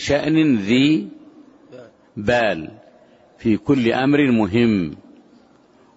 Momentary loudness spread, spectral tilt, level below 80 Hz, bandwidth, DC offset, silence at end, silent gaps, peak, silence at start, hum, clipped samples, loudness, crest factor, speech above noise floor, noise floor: 13 LU; -6.5 dB/octave; -50 dBFS; 8 kHz; under 0.1%; 1 s; none; -4 dBFS; 0 s; none; under 0.1%; -18 LUFS; 16 dB; 35 dB; -53 dBFS